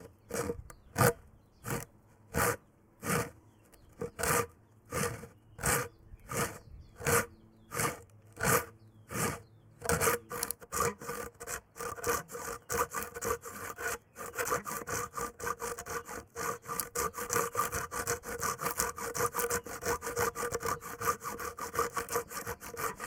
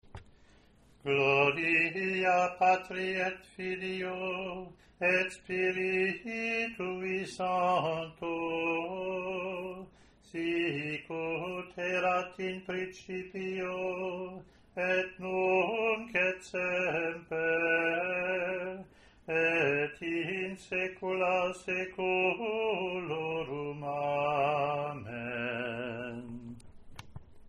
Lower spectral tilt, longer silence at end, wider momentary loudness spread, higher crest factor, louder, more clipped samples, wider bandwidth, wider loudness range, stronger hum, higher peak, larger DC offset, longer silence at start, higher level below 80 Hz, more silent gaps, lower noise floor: second, -3 dB/octave vs -5.5 dB/octave; about the same, 0 s vs 0 s; about the same, 12 LU vs 12 LU; first, 26 dB vs 20 dB; second, -35 LUFS vs -32 LUFS; neither; first, 18 kHz vs 11 kHz; second, 3 LU vs 6 LU; neither; first, -10 dBFS vs -14 dBFS; neither; about the same, 0 s vs 0.1 s; first, -56 dBFS vs -64 dBFS; neither; about the same, -60 dBFS vs -61 dBFS